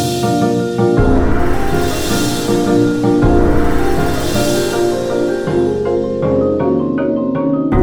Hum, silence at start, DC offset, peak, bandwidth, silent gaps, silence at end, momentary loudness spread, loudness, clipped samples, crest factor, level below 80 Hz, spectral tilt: none; 0 s; 0.6%; 0 dBFS; over 20 kHz; none; 0 s; 4 LU; -15 LUFS; under 0.1%; 12 dB; -24 dBFS; -6 dB/octave